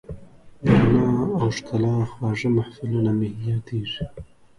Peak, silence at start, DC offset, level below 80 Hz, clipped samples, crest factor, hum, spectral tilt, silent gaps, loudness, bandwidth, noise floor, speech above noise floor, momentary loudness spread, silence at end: -4 dBFS; 0.1 s; under 0.1%; -46 dBFS; under 0.1%; 18 dB; none; -7.5 dB/octave; none; -23 LUFS; 10.5 kHz; -43 dBFS; 19 dB; 13 LU; 0.35 s